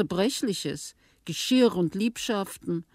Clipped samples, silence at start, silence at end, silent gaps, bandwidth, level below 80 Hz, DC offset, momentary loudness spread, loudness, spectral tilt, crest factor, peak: under 0.1%; 0 s; 0.1 s; none; 16 kHz; -62 dBFS; under 0.1%; 15 LU; -27 LUFS; -4.5 dB/octave; 18 dB; -10 dBFS